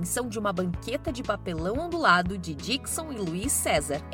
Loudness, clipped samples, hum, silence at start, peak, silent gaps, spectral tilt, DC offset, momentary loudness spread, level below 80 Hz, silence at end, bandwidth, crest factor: -27 LUFS; under 0.1%; none; 0 s; -6 dBFS; none; -3.5 dB/octave; under 0.1%; 10 LU; -44 dBFS; 0 s; 17 kHz; 22 dB